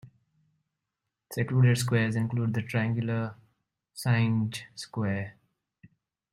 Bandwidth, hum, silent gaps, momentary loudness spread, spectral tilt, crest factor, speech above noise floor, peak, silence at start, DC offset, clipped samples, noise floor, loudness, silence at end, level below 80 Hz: 15 kHz; none; none; 15 LU; -6.5 dB/octave; 18 dB; 59 dB; -12 dBFS; 0.05 s; under 0.1%; under 0.1%; -86 dBFS; -28 LUFS; 1 s; -64 dBFS